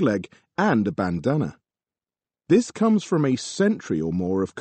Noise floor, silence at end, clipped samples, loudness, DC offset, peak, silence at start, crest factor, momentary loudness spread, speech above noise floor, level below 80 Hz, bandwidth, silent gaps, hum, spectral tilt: under -90 dBFS; 0 s; under 0.1%; -23 LUFS; under 0.1%; -8 dBFS; 0 s; 16 dB; 5 LU; over 68 dB; -58 dBFS; 8.8 kHz; none; none; -6.5 dB/octave